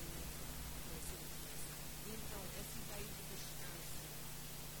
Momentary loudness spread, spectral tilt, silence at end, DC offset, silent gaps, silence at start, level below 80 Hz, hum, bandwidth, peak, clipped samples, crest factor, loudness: 1 LU; -3 dB/octave; 0 s; 0.2%; none; 0 s; -56 dBFS; none; 18 kHz; -32 dBFS; under 0.1%; 14 dB; -48 LUFS